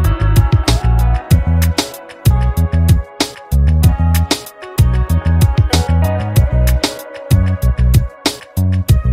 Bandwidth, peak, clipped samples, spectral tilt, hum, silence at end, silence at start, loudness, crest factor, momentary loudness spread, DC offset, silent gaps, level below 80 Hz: 16.5 kHz; 0 dBFS; under 0.1%; -5.5 dB/octave; none; 0 s; 0 s; -14 LUFS; 12 dB; 7 LU; under 0.1%; none; -16 dBFS